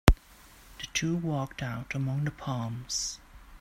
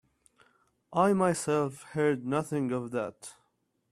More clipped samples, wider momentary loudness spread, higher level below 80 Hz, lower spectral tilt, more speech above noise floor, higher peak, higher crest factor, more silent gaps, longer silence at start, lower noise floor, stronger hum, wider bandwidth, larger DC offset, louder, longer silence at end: neither; second, 8 LU vs 11 LU; first, -36 dBFS vs -70 dBFS; second, -4.5 dB/octave vs -6 dB/octave; second, 22 dB vs 46 dB; first, 0 dBFS vs -12 dBFS; first, 30 dB vs 20 dB; neither; second, 0.05 s vs 0.9 s; second, -55 dBFS vs -75 dBFS; neither; first, 16 kHz vs 13.5 kHz; neither; about the same, -32 LUFS vs -30 LUFS; second, 0 s vs 0.6 s